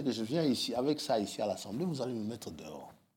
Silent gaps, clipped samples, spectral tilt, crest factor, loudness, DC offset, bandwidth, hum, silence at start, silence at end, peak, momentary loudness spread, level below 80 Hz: none; under 0.1%; -5 dB/octave; 16 dB; -34 LUFS; under 0.1%; 17 kHz; none; 0 s; 0.25 s; -20 dBFS; 14 LU; -74 dBFS